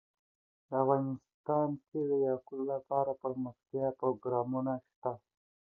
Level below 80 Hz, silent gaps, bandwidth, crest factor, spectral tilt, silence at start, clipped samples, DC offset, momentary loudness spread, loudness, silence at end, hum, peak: -76 dBFS; 1.34-1.44 s, 4.96-5.02 s; 2.1 kHz; 20 dB; -12 dB/octave; 0.7 s; under 0.1%; under 0.1%; 9 LU; -35 LUFS; 0.6 s; none; -14 dBFS